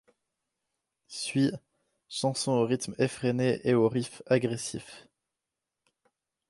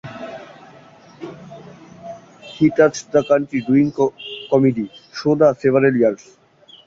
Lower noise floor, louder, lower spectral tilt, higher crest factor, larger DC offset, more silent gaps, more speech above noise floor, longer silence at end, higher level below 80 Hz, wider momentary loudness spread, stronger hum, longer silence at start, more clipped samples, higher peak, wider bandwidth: first, -88 dBFS vs -45 dBFS; second, -29 LUFS vs -17 LUFS; about the same, -5.5 dB/octave vs -6.5 dB/octave; about the same, 20 dB vs 18 dB; neither; neither; first, 59 dB vs 29 dB; first, 1.5 s vs 0.7 s; second, -68 dBFS vs -58 dBFS; second, 14 LU vs 22 LU; neither; first, 1.1 s vs 0.05 s; neither; second, -12 dBFS vs -2 dBFS; first, 11.5 kHz vs 7.8 kHz